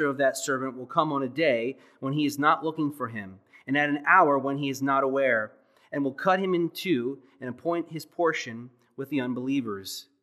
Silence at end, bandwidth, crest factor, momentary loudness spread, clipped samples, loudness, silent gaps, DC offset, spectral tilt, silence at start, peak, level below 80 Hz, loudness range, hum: 0.2 s; 15 kHz; 22 dB; 14 LU; under 0.1%; -26 LUFS; none; under 0.1%; -5 dB/octave; 0 s; -6 dBFS; -84 dBFS; 5 LU; none